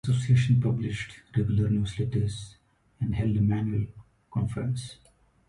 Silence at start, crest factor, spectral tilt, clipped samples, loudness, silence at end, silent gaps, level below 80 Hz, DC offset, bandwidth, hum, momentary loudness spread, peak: 0.05 s; 16 dB; -7.5 dB/octave; under 0.1%; -28 LUFS; 0.55 s; none; -46 dBFS; under 0.1%; 11 kHz; none; 12 LU; -12 dBFS